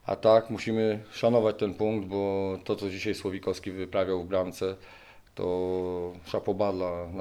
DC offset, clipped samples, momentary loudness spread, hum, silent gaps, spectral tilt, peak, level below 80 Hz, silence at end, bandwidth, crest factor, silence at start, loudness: under 0.1%; under 0.1%; 10 LU; none; none; -6.5 dB/octave; -8 dBFS; -60 dBFS; 0 s; 14 kHz; 20 dB; 0.05 s; -29 LUFS